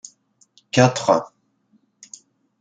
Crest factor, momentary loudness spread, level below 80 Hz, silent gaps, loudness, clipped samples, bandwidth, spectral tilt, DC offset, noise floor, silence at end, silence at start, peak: 22 dB; 25 LU; -64 dBFS; none; -19 LUFS; under 0.1%; 9.4 kHz; -5 dB/octave; under 0.1%; -63 dBFS; 1.35 s; 0.75 s; -2 dBFS